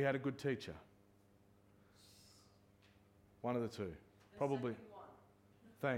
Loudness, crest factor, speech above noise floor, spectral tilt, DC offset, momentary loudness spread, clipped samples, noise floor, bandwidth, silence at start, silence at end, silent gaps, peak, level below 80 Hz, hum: -43 LUFS; 22 dB; 29 dB; -7 dB/octave; under 0.1%; 23 LU; under 0.1%; -70 dBFS; 16.5 kHz; 0 s; 0 s; none; -22 dBFS; -74 dBFS; none